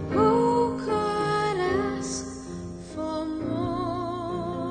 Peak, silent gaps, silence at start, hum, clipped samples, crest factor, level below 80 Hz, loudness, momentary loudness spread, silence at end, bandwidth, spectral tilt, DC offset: -10 dBFS; none; 0 s; none; under 0.1%; 16 dB; -50 dBFS; -27 LUFS; 14 LU; 0 s; 9.4 kHz; -5.5 dB/octave; under 0.1%